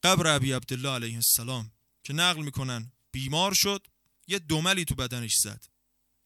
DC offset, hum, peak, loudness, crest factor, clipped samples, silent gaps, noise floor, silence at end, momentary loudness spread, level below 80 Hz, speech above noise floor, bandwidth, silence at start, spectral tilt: under 0.1%; none; -6 dBFS; -26 LUFS; 22 dB; under 0.1%; none; -74 dBFS; 0.65 s; 13 LU; -52 dBFS; 46 dB; 17.5 kHz; 0.05 s; -2.5 dB/octave